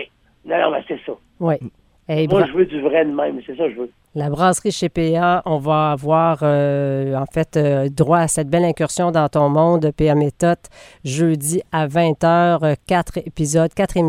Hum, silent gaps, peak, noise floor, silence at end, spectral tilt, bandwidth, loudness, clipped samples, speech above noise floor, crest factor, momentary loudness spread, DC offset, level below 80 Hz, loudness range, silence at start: none; none; -2 dBFS; -36 dBFS; 0 s; -6 dB/octave; 15.5 kHz; -18 LUFS; under 0.1%; 19 dB; 16 dB; 9 LU; under 0.1%; -44 dBFS; 3 LU; 0 s